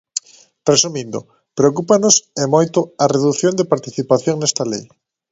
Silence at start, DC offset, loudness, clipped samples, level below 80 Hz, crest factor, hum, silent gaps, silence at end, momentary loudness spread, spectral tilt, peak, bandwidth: 0.15 s; under 0.1%; -16 LUFS; under 0.1%; -58 dBFS; 18 dB; none; none; 0.45 s; 13 LU; -4 dB/octave; 0 dBFS; 8 kHz